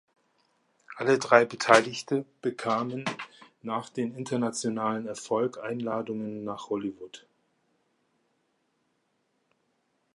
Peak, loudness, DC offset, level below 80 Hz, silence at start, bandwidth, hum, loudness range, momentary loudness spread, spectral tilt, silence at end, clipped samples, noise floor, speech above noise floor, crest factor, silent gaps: -2 dBFS; -28 LUFS; under 0.1%; -76 dBFS; 0.9 s; 11.5 kHz; none; 13 LU; 16 LU; -4.5 dB/octave; 2.95 s; under 0.1%; -75 dBFS; 47 dB; 28 dB; none